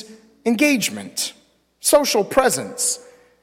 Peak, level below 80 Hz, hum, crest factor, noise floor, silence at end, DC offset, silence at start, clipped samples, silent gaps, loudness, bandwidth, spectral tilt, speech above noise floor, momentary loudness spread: -4 dBFS; -56 dBFS; none; 18 dB; -47 dBFS; 0.4 s; under 0.1%; 0 s; under 0.1%; none; -19 LUFS; 16.5 kHz; -2.5 dB/octave; 28 dB; 10 LU